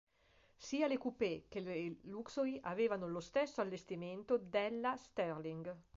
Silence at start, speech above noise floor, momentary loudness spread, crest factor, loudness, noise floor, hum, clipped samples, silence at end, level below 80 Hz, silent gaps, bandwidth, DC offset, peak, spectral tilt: 0.6 s; 31 dB; 9 LU; 16 dB; -41 LUFS; -72 dBFS; none; under 0.1%; 0.15 s; -74 dBFS; none; 7.6 kHz; under 0.1%; -24 dBFS; -4.5 dB/octave